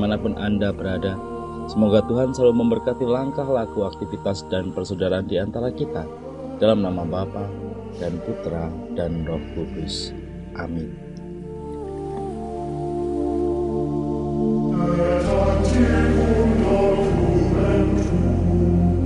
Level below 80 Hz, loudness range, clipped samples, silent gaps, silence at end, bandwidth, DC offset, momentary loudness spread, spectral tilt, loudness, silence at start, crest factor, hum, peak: -32 dBFS; 11 LU; under 0.1%; none; 0 s; 11 kHz; 0.1%; 13 LU; -7.5 dB/octave; -22 LUFS; 0 s; 18 dB; none; -4 dBFS